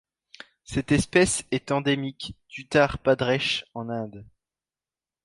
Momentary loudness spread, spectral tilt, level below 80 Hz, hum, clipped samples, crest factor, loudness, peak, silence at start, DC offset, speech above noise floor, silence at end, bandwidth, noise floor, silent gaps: 16 LU; -4.5 dB/octave; -48 dBFS; none; under 0.1%; 20 dB; -24 LUFS; -6 dBFS; 0.7 s; under 0.1%; over 65 dB; 1 s; 11.5 kHz; under -90 dBFS; none